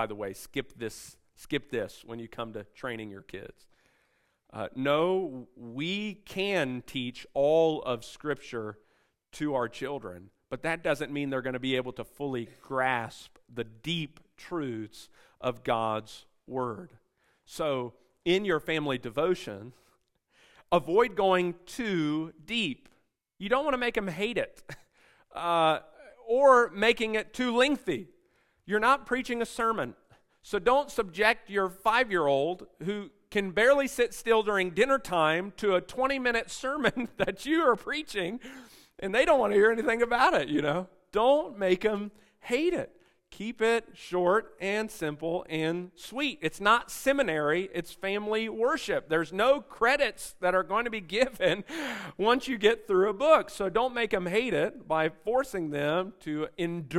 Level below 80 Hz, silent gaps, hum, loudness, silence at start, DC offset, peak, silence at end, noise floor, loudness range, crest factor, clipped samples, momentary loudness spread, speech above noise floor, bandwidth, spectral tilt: -58 dBFS; none; none; -28 LUFS; 0 s; under 0.1%; -8 dBFS; 0 s; -72 dBFS; 8 LU; 22 dB; under 0.1%; 15 LU; 43 dB; 16 kHz; -4.5 dB/octave